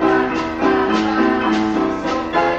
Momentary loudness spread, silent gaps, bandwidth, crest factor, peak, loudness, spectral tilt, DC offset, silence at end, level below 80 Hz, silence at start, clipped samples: 4 LU; none; 8 kHz; 14 dB; -2 dBFS; -17 LUFS; -5.5 dB/octave; under 0.1%; 0 s; -42 dBFS; 0 s; under 0.1%